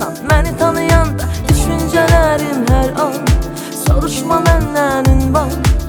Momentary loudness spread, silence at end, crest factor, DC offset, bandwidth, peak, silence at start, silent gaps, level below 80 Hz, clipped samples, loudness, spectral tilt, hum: 5 LU; 0 s; 12 dB; under 0.1%; 20 kHz; 0 dBFS; 0 s; none; -18 dBFS; under 0.1%; -14 LUFS; -5.5 dB/octave; none